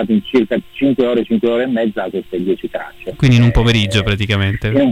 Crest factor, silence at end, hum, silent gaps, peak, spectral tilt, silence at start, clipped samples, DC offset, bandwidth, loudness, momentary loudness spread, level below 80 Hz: 12 dB; 0 s; none; none; -4 dBFS; -7 dB/octave; 0 s; under 0.1%; under 0.1%; 11.5 kHz; -15 LUFS; 10 LU; -30 dBFS